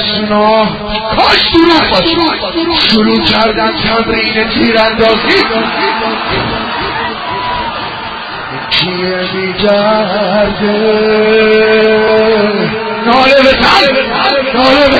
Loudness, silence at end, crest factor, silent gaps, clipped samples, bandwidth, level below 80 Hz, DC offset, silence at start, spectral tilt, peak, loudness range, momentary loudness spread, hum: -9 LUFS; 0 s; 10 dB; none; 0.3%; 8 kHz; -34 dBFS; under 0.1%; 0 s; -5.5 dB/octave; 0 dBFS; 6 LU; 9 LU; none